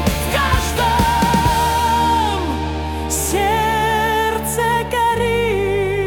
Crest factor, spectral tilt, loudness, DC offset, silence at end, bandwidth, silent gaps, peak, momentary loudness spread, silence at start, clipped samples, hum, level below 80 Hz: 14 dB; -4 dB/octave; -17 LUFS; under 0.1%; 0 s; 18 kHz; none; -4 dBFS; 5 LU; 0 s; under 0.1%; none; -28 dBFS